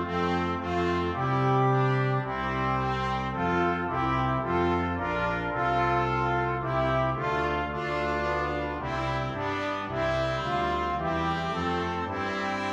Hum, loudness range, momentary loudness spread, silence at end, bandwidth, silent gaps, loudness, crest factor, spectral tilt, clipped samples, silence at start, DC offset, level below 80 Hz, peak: none; 2 LU; 5 LU; 0 s; 8 kHz; none; -28 LUFS; 16 dB; -7 dB/octave; under 0.1%; 0 s; under 0.1%; -44 dBFS; -12 dBFS